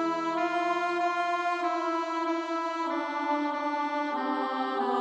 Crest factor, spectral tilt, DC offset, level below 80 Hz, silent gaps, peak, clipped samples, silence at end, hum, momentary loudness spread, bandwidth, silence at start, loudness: 14 dB; -3.5 dB/octave; under 0.1%; -84 dBFS; none; -16 dBFS; under 0.1%; 0 s; none; 3 LU; 8.6 kHz; 0 s; -29 LUFS